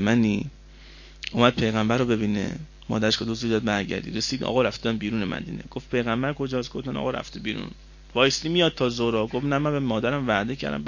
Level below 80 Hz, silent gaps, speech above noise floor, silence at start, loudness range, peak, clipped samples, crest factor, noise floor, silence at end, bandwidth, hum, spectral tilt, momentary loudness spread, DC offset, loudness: -46 dBFS; none; 21 dB; 0 s; 3 LU; -2 dBFS; under 0.1%; 22 dB; -46 dBFS; 0 s; 7.4 kHz; none; -5 dB/octave; 10 LU; under 0.1%; -25 LUFS